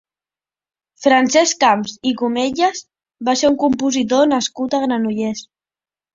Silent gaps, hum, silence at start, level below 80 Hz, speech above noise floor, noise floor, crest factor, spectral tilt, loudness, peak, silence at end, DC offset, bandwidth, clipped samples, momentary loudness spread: none; none; 1 s; -58 dBFS; over 74 dB; under -90 dBFS; 16 dB; -3 dB/octave; -17 LUFS; 0 dBFS; 0.7 s; under 0.1%; 7.8 kHz; under 0.1%; 9 LU